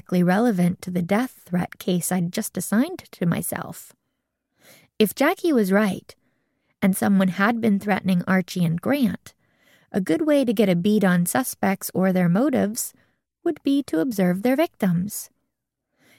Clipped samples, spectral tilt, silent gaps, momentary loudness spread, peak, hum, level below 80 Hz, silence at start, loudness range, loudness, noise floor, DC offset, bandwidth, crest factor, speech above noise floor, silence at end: under 0.1%; -6 dB/octave; none; 9 LU; -4 dBFS; none; -64 dBFS; 0.1 s; 4 LU; -22 LUFS; -79 dBFS; under 0.1%; 17 kHz; 18 dB; 58 dB; 0.95 s